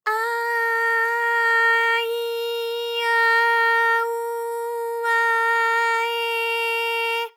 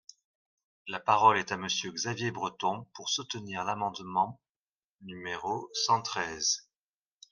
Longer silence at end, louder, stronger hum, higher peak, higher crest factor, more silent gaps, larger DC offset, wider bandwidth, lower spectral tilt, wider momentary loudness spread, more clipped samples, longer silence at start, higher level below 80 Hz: second, 0.05 s vs 0.7 s; first, -20 LUFS vs -30 LUFS; neither; about the same, -10 dBFS vs -10 dBFS; second, 12 dB vs 24 dB; second, none vs 4.49-4.99 s; neither; first, over 20 kHz vs 11 kHz; second, 4 dB/octave vs -2.5 dB/octave; second, 9 LU vs 13 LU; neither; second, 0.05 s vs 0.85 s; second, under -90 dBFS vs -74 dBFS